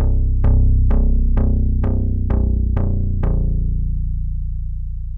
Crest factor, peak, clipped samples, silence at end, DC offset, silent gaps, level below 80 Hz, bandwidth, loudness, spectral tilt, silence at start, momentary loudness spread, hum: 10 dB; -6 dBFS; under 0.1%; 0 s; under 0.1%; none; -16 dBFS; 2.3 kHz; -20 LUFS; -12.5 dB/octave; 0 s; 10 LU; none